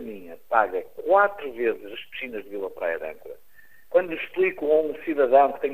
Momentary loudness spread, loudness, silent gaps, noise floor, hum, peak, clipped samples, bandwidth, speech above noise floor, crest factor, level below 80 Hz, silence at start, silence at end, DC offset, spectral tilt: 17 LU; -24 LUFS; none; -53 dBFS; none; -6 dBFS; under 0.1%; 15.5 kHz; 29 dB; 20 dB; -62 dBFS; 0 s; 0 s; 0.5%; -6 dB/octave